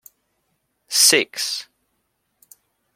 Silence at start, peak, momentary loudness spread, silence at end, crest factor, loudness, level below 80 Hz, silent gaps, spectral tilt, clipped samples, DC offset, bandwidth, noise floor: 0.9 s; 0 dBFS; 13 LU; 1.35 s; 24 dB; -17 LUFS; -76 dBFS; none; 0.5 dB/octave; under 0.1%; under 0.1%; 16.5 kHz; -72 dBFS